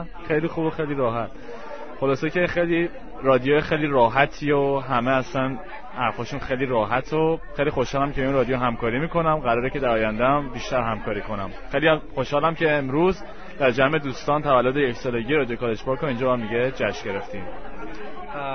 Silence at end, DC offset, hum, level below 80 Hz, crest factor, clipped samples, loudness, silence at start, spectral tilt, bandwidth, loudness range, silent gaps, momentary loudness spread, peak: 0 s; 2%; none; -42 dBFS; 20 dB; under 0.1%; -23 LUFS; 0 s; -6.5 dB/octave; 6.6 kHz; 3 LU; none; 12 LU; -2 dBFS